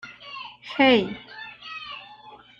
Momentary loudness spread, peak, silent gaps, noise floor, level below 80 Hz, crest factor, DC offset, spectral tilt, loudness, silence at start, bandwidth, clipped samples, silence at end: 21 LU; -6 dBFS; none; -47 dBFS; -62 dBFS; 22 dB; under 0.1%; -5.5 dB/octave; -21 LUFS; 0.05 s; 7.2 kHz; under 0.1%; 0.3 s